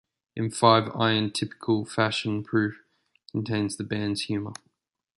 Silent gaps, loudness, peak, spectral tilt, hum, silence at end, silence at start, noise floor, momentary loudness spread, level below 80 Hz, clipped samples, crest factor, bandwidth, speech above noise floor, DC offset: none; -26 LUFS; -4 dBFS; -5 dB/octave; none; 0.65 s; 0.35 s; -73 dBFS; 13 LU; -62 dBFS; under 0.1%; 24 dB; 11.5 kHz; 47 dB; under 0.1%